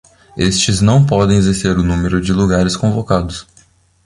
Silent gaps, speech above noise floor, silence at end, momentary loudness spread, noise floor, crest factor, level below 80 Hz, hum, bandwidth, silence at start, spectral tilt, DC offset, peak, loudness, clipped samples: none; 37 dB; 0.65 s; 7 LU; -50 dBFS; 14 dB; -30 dBFS; none; 11.5 kHz; 0.35 s; -5.5 dB/octave; under 0.1%; 0 dBFS; -14 LUFS; under 0.1%